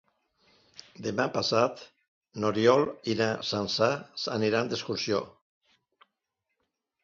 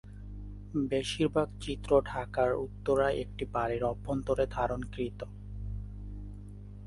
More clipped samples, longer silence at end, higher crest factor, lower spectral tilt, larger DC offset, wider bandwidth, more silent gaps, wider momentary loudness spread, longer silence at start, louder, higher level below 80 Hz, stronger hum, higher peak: neither; first, 1.75 s vs 0 s; about the same, 22 dB vs 20 dB; second, -4.5 dB/octave vs -6 dB/octave; neither; second, 7.6 kHz vs 11.5 kHz; first, 2.08-2.21 s vs none; second, 12 LU vs 17 LU; first, 1 s vs 0.05 s; first, -28 LUFS vs -32 LUFS; second, -66 dBFS vs -46 dBFS; second, none vs 50 Hz at -45 dBFS; first, -8 dBFS vs -12 dBFS